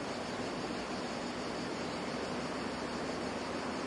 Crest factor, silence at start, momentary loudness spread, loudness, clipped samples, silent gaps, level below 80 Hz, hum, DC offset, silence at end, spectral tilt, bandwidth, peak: 14 dB; 0 s; 1 LU; -38 LUFS; under 0.1%; none; -60 dBFS; none; under 0.1%; 0 s; -4.5 dB/octave; 11.5 kHz; -24 dBFS